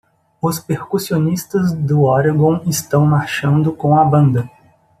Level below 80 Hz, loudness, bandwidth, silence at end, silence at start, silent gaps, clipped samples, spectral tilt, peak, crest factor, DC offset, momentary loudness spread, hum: -54 dBFS; -16 LUFS; 14.5 kHz; 0.55 s; 0.45 s; none; under 0.1%; -6.5 dB/octave; -2 dBFS; 14 dB; under 0.1%; 9 LU; none